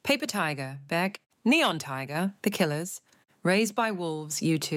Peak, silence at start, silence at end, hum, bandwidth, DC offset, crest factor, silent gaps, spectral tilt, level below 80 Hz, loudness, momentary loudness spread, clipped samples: -12 dBFS; 0.05 s; 0 s; none; 17 kHz; under 0.1%; 18 dB; 1.26-1.30 s; -4 dB/octave; -74 dBFS; -28 LUFS; 10 LU; under 0.1%